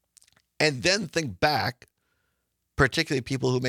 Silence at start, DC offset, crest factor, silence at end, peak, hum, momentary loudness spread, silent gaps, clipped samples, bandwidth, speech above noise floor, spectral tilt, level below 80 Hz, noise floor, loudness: 0.6 s; under 0.1%; 20 dB; 0 s; -6 dBFS; none; 7 LU; none; under 0.1%; 15.5 kHz; 52 dB; -4 dB/octave; -50 dBFS; -77 dBFS; -25 LUFS